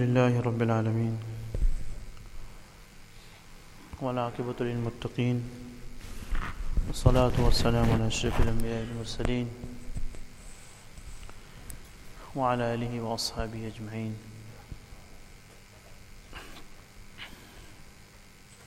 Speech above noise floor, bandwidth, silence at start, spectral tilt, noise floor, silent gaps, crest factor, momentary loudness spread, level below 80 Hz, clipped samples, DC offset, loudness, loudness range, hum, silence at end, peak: 25 dB; 15 kHz; 0 s; -6 dB/octave; -52 dBFS; none; 24 dB; 26 LU; -36 dBFS; under 0.1%; under 0.1%; -30 LUFS; 18 LU; none; 0 s; -8 dBFS